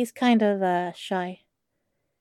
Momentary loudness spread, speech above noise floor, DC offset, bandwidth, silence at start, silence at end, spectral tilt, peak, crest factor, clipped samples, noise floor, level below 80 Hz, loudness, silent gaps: 9 LU; 54 dB; under 0.1%; 13.5 kHz; 0 s; 0.85 s; -6 dB/octave; -10 dBFS; 16 dB; under 0.1%; -78 dBFS; -84 dBFS; -24 LUFS; none